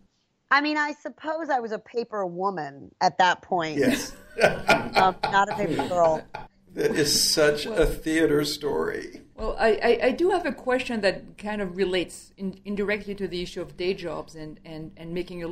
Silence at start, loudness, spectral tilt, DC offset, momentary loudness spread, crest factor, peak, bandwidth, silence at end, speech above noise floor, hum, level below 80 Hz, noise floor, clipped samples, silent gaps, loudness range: 0.5 s; -25 LUFS; -3.5 dB/octave; under 0.1%; 14 LU; 22 dB; -4 dBFS; 16 kHz; 0 s; 41 dB; none; -44 dBFS; -66 dBFS; under 0.1%; none; 7 LU